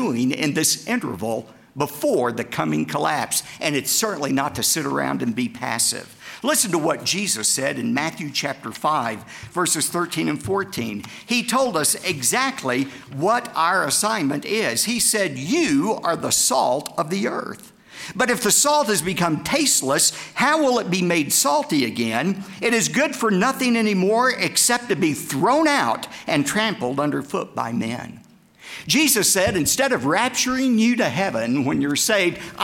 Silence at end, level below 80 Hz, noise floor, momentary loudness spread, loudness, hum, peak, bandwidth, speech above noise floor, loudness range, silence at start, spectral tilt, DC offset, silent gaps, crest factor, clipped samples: 0 s; -58 dBFS; -46 dBFS; 9 LU; -20 LUFS; none; -4 dBFS; 17 kHz; 25 dB; 4 LU; 0 s; -3 dB/octave; under 0.1%; none; 16 dB; under 0.1%